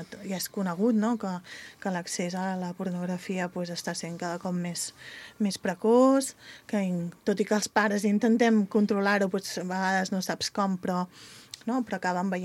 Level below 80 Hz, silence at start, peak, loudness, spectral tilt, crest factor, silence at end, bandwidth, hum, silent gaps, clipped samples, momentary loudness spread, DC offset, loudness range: -72 dBFS; 0 s; -8 dBFS; -28 LUFS; -5 dB/octave; 20 dB; 0 s; 15 kHz; none; none; under 0.1%; 12 LU; under 0.1%; 7 LU